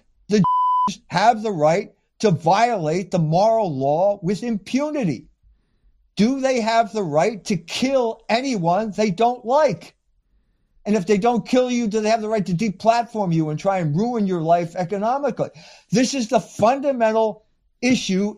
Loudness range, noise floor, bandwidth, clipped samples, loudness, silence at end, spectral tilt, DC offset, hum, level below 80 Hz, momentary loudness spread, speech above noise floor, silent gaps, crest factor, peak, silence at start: 3 LU; -63 dBFS; 12 kHz; under 0.1%; -20 LUFS; 0 s; -6 dB/octave; under 0.1%; none; -56 dBFS; 6 LU; 44 dB; none; 16 dB; -4 dBFS; 0.3 s